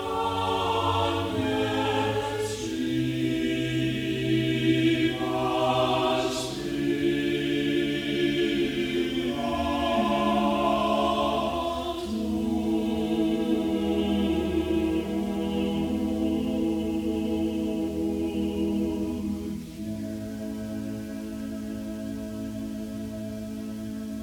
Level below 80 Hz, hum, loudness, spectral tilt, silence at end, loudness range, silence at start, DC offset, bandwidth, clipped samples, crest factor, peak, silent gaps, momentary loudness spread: -46 dBFS; none; -27 LUFS; -6 dB/octave; 0 s; 8 LU; 0 s; under 0.1%; 17.5 kHz; under 0.1%; 16 dB; -12 dBFS; none; 10 LU